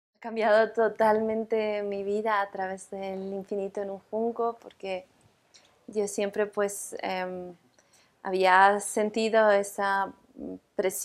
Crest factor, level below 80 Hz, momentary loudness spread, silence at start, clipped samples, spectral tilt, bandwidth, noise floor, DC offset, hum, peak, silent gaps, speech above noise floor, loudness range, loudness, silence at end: 22 dB; -72 dBFS; 14 LU; 0.2 s; under 0.1%; -3.5 dB/octave; 15.5 kHz; -63 dBFS; under 0.1%; none; -6 dBFS; none; 36 dB; 8 LU; -27 LUFS; 0 s